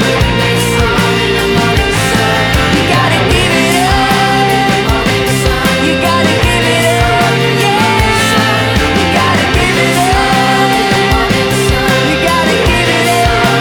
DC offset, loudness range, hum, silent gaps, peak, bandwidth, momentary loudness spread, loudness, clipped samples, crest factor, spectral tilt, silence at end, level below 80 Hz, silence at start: under 0.1%; 0 LU; none; none; 0 dBFS; over 20 kHz; 1 LU; -10 LUFS; under 0.1%; 10 dB; -4.5 dB/octave; 0 s; -22 dBFS; 0 s